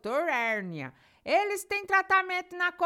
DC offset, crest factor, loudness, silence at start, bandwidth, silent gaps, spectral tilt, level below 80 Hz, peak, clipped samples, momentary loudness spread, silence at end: under 0.1%; 18 dB; -27 LUFS; 0.05 s; 17.5 kHz; none; -3.5 dB/octave; -70 dBFS; -12 dBFS; under 0.1%; 16 LU; 0 s